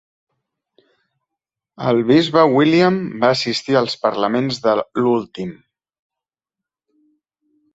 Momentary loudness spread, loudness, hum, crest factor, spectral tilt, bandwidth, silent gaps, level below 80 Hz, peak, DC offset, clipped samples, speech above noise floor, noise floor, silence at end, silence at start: 9 LU; -17 LUFS; none; 18 dB; -6 dB/octave; 8 kHz; none; -60 dBFS; -2 dBFS; under 0.1%; under 0.1%; 71 dB; -87 dBFS; 2.2 s; 1.8 s